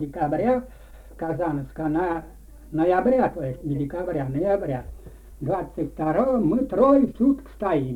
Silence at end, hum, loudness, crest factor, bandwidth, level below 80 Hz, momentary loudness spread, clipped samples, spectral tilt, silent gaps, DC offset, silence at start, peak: 0 s; none; -24 LUFS; 16 dB; 13.5 kHz; -44 dBFS; 12 LU; under 0.1%; -9.5 dB/octave; none; under 0.1%; 0 s; -6 dBFS